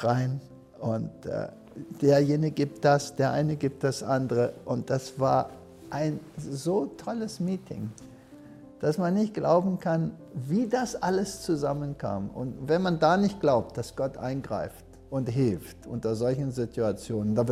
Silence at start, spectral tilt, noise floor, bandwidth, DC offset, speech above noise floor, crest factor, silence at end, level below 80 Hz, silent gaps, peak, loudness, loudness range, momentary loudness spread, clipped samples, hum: 0 s; -7 dB/octave; -49 dBFS; 15 kHz; under 0.1%; 21 dB; 20 dB; 0 s; -56 dBFS; none; -8 dBFS; -28 LUFS; 5 LU; 13 LU; under 0.1%; none